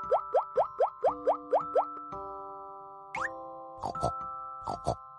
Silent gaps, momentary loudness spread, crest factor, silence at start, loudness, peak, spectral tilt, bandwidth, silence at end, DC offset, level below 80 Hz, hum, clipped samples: none; 15 LU; 16 dB; 0 s; -32 LUFS; -16 dBFS; -6 dB/octave; 11.5 kHz; 0 s; under 0.1%; -58 dBFS; none; under 0.1%